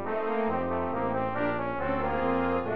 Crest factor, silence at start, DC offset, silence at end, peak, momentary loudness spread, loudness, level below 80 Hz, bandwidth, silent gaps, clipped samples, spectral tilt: 12 dB; 0 s; 1%; 0 s; -16 dBFS; 3 LU; -29 LUFS; -50 dBFS; 5.4 kHz; none; under 0.1%; -9.5 dB/octave